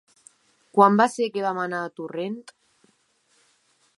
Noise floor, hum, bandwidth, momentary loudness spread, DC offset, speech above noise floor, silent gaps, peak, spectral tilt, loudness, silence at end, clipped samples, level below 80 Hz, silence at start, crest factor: -66 dBFS; none; 11.5 kHz; 15 LU; under 0.1%; 44 dB; none; -2 dBFS; -5.5 dB/octave; -23 LUFS; 1.55 s; under 0.1%; -80 dBFS; 0.75 s; 24 dB